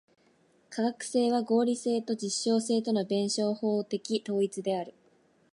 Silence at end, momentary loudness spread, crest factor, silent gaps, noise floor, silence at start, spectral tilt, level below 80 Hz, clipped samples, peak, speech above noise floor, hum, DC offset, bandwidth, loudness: 0.65 s; 6 LU; 16 dB; none; -66 dBFS; 0.7 s; -4.5 dB/octave; -82 dBFS; under 0.1%; -14 dBFS; 37 dB; none; under 0.1%; 11.5 kHz; -29 LUFS